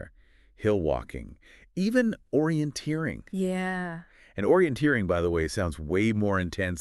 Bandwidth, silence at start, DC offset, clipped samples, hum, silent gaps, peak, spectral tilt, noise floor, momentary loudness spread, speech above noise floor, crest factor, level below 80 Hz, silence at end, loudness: 13 kHz; 0 s; under 0.1%; under 0.1%; none; none; -10 dBFS; -6.5 dB/octave; -57 dBFS; 15 LU; 30 dB; 18 dB; -46 dBFS; 0 s; -27 LUFS